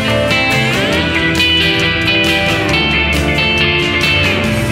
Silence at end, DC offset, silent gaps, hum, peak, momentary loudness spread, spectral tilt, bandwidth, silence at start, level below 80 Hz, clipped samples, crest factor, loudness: 0 s; under 0.1%; none; none; 0 dBFS; 2 LU; -4.5 dB/octave; 16.5 kHz; 0 s; -28 dBFS; under 0.1%; 12 dB; -11 LUFS